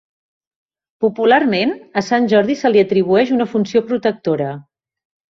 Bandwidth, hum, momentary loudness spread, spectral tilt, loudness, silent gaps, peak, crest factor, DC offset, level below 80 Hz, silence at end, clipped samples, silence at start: 7.6 kHz; none; 7 LU; -6 dB/octave; -16 LUFS; none; -2 dBFS; 16 dB; under 0.1%; -60 dBFS; 0.8 s; under 0.1%; 1 s